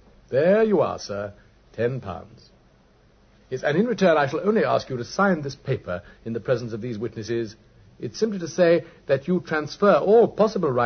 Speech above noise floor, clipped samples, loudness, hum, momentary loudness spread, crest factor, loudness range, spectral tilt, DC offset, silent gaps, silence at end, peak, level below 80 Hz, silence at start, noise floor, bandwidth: 34 dB; under 0.1%; -23 LUFS; none; 14 LU; 18 dB; 6 LU; -6.5 dB/octave; under 0.1%; none; 0 s; -6 dBFS; -56 dBFS; 0.3 s; -57 dBFS; 6.6 kHz